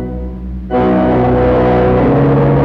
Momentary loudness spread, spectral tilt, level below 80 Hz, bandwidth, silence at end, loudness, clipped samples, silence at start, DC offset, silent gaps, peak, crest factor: 13 LU; -10.5 dB/octave; -24 dBFS; 5.4 kHz; 0 s; -11 LUFS; under 0.1%; 0 s; under 0.1%; none; -2 dBFS; 8 dB